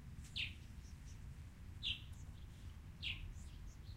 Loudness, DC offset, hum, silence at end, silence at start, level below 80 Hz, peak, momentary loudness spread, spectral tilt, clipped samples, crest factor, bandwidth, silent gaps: -49 LUFS; under 0.1%; none; 0 s; 0 s; -56 dBFS; -28 dBFS; 12 LU; -3.5 dB/octave; under 0.1%; 22 dB; 16 kHz; none